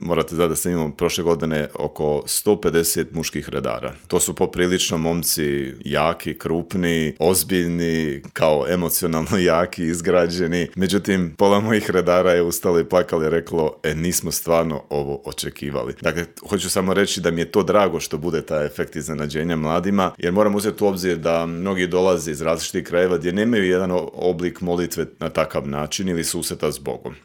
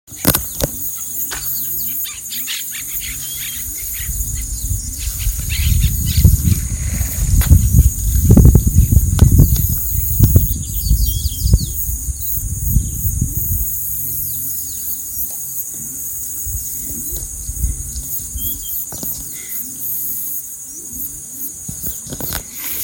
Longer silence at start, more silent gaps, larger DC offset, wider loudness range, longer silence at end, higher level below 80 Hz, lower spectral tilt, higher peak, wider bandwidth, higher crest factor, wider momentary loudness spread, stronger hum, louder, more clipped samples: about the same, 0 s vs 0.1 s; neither; neither; second, 3 LU vs 9 LU; about the same, 0.05 s vs 0 s; second, -46 dBFS vs -20 dBFS; about the same, -4.5 dB/octave vs -4.5 dB/octave; about the same, 0 dBFS vs 0 dBFS; about the same, 17.5 kHz vs 17 kHz; about the same, 20 dB vs 16 dB; about the same, 8 LU vs 10 LU; neither; second, -21 LUFS vs -17 LUFS; second, under 0.1% vs 0.4%